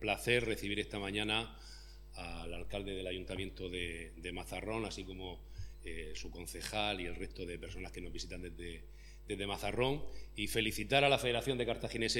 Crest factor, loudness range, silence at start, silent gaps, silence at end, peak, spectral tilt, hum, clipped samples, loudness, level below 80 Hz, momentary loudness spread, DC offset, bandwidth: 24 dB; 8 LU; 0 s; none; 0 s; -14 dBFS; -4 dB/octave; none; under 0.1%; -38 LUFS; -50 dBFS; 16 LU; under 0.1%; 19 kHz